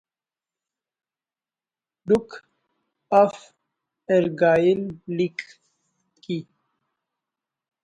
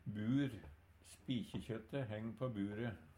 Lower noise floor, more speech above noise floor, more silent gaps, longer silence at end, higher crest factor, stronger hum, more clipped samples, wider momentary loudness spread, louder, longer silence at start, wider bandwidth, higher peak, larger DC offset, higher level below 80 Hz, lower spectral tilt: first, under -90 dBFS vs -63 dBFS; first, over 69 dB vs 19 dB; neither; first, 1.4 s vs 0.05 s; about the same, 20 dB vs 16 dB; neither; neither; about the same, 17 LU vs 18 LU; first, -22 LUFS vs -43 LUFS; first, 2.05 s vs 0.05 s; second, 10.5 kHz vs 15.5 kHz; first, -6 dBFS vs -28 dBFS; neither; about the same, -64 dBFS vs -66 dBFS; about the same, -7 dB/octave vs -7.5 dB/octave